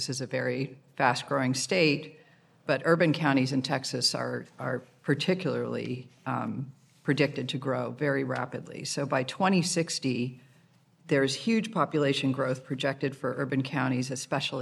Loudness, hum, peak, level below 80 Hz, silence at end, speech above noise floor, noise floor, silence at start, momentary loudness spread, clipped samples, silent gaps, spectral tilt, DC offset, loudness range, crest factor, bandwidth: -29 LUFS; none; -8 dBFS; -78 dBFS; 0 s; 33 dB; -62 dBFS; 0 s; 10 LU; under 0.1%; none; -5 dB/octave; under 0.1%; 4 LU; 22 dB; 13 kHz